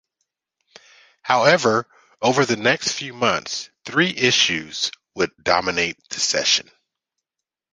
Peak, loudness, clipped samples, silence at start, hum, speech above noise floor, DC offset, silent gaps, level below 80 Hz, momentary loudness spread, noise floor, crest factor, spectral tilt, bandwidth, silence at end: -2 dBFS; -20 LUFS; under 0.1%; 1.25 s; none; 66 dB; under 0.1%; none; -58 dBFS; 9 LU; -86 dBFS; 20 dB; -2.5 dB/octave; 10.5 kHz; 1.1 s